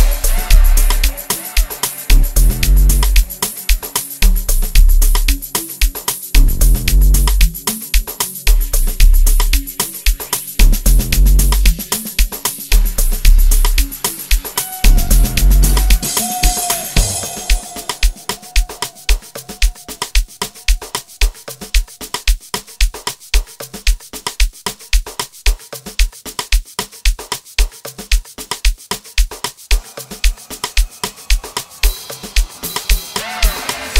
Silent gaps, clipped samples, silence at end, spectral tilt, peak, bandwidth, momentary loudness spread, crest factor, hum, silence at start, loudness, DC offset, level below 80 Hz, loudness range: none; under 0.1%; 0 s; -2.5 dB/octave; 0 dBFS; 16.5 kHz; 8 LU; 14 dB; none; 0 s; -17 LUFS; 0.8%; -14 dBFS; 6 LU